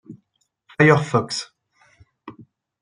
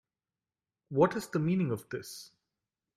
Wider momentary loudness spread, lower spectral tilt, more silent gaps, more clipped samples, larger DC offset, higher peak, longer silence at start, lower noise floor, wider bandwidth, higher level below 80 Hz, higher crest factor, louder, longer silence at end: first, 24 LU vs 15 LU; second, -5.5 dB/octave vs -7 dB/octave; neither; neither; neither; first, -2 dBFS vs -12 dBFS; second, 0.1 s vs 0.9 s; second, -70 dBFS vs under -90 dBFS; second, 10.5 kHz vs 15.5 kHz; first, -60 dBFS vs -70 dBFS; about the same, 22 dB vs 22 dB; first, -18 LUFS vs -31 LUFS; second, 0.4 s vs 0.7 s